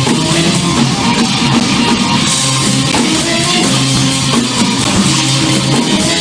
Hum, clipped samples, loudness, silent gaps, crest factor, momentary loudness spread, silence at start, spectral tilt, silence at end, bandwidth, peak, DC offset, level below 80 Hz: none; under 0.1%; -10 LUFS; none; 12 dB; 1 LU; 0 s; -3.5 dB/octave; 0 s; 10.5 kHz; 0 dBFS; under 0.1%; -36 dBFS